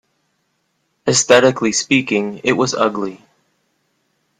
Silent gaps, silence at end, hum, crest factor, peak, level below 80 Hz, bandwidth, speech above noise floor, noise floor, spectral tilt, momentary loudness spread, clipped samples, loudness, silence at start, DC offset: none; 1.25 s; none; 18 dB; 0 dBFS; -58 dBFS; 13.5 kHz; 52 dB; -67 dBFS; -3 dB/octave; 11 LU; under 0.1%; -15 LUFS; 1.05 s; under 0.1%